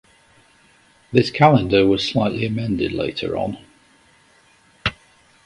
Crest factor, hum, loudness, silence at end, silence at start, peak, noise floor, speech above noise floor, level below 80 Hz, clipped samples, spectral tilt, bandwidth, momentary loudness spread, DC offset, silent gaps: 20 dB; none; -19 LUFS; 0.55 s; 1.1 s; 0 dBFS; -55 dBFS; 37 dB; -46 dBFS; under 0.1%; -7 dB/octave; 11.5 kHz; 12 LU; under 0.1%; none